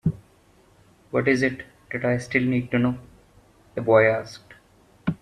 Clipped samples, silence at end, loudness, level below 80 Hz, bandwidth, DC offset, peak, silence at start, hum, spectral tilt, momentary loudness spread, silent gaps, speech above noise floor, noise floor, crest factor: under 0.1%; 0.05 s; -23 LUFS; -54 dBFS; 11.5 kHz; under 0.1%; -4 dBFS; 0.05 s; none; -7 dB/octave; 20 LU; none; 35 dB; -57 dBFS; 20 dB